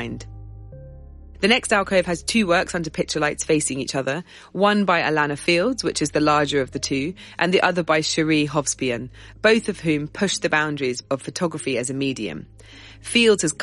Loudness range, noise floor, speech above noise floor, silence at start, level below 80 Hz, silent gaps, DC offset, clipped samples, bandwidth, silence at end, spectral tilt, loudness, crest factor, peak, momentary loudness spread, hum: 2 LU; -41 dBFS; 19 dB; 0 s; -48 dBFS; none; under 0.1%; under 0.1%; 11.5 kHz; 0 s; -4 dB/octave; -21 LUFS; 18 dB; -4 dBFS; 12 LU; none